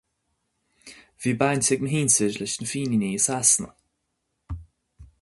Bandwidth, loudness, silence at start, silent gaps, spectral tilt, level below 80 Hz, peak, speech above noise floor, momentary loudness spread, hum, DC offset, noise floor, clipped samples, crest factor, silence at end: 12 kHz; -22 LUFS; 0.85 s; none; -3.5 dB/octave; -50 dBFS; -4 dBFS; 54 dB; 20 LU; none; under 0.1%; -77 dBFS; under 0.1%; 22 dB; 0.15 s